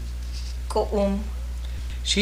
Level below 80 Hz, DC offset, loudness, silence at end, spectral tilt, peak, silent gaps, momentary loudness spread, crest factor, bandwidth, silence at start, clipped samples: -30 dBFS; under 0.1%; -28 LUFS; 0 s; -4.5 dB/octave; -10 dBFS; none; 9 LU; 16 dB; 15.5 kHz; 0 s; under 0.1%